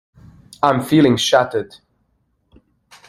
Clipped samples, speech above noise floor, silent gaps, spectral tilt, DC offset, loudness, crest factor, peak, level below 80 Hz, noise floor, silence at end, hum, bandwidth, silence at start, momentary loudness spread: under 0.1%; 50 dB; none; -5 dB/octave; under 0.1%; -16 LUFS; 20 dB; 0 dBFS; -56 dBFS; -65 dBFS; 1.45 s; none; 16 kHz; 0.6 s; 12 LU